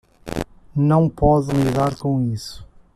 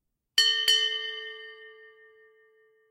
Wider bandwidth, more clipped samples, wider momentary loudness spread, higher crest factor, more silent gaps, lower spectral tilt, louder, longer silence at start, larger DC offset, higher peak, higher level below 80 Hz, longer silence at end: second, 14 kHz vs 16 kHz; neither; second, 13 LU vs 21 LU; second, 16 dB vs 22 dB; neither; first, -8 dB/octave vs 4.5 dB/octave; first, -20 LUFS vs -23 LUFS; about the same, 0.25 s vs 0.35 s; neither; first, -4 dBFS vs -8 dBFS; first, -36 dBFS vs -78 dBFS; second, 0.3 s vs 1.2 s